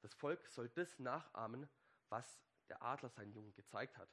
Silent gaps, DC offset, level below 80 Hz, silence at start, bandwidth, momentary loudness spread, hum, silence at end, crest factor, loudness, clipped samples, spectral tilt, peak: none; under 0.1%; under -90 dBFS; 0 s; 12 kHz; 13 LU; none; 0 s; 20 dB; -50 LUFS; under 0.1%; -5.5 dB/octave; -30 dBFS